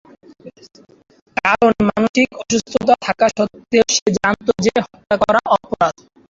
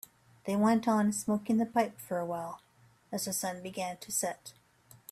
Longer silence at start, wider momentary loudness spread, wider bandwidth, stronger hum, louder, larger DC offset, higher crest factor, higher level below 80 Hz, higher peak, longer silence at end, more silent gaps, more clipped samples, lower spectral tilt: about the same, 0.45 s vs 0.45 s; second, 6 LU vs 18 LU; second, 7.8 kHz vs 16 kHz; neither; first, -16 LUFS vs -32 LUFS; neither; about the same, 16 dB vs 18 dB; first, -48 dBFS vs -74 dBFS; first, -2 dBFS vs -14 dBFS; second, 0.4 s vs 0.6 s; first, 1.22-1.26 s, 2.09-2.14 s, 4.02-4.06 s vs none; neither; about the same, -4 dB/octave vs -4.5 dB/octave